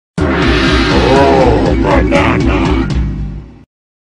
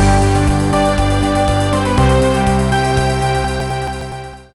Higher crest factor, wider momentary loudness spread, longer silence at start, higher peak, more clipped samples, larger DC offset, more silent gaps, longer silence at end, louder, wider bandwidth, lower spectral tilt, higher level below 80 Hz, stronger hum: about the same, 10 dB vs 10 dB; about the same, 11 LU vs 9 LU; first, 0.15 s vs 0 s; first, 0 dBFS vs -4 dBFS; neither; neither; neither; first, 0.55 s vs 0.15 s; first, -11 LUFS vs -15 LUFS; second, 10.5 kHz vs 12.5 kHz; about the same, -6.5 dB/octave vs -6 dB/octave; about the same, -18 dBFS vs -22 dBFS; neither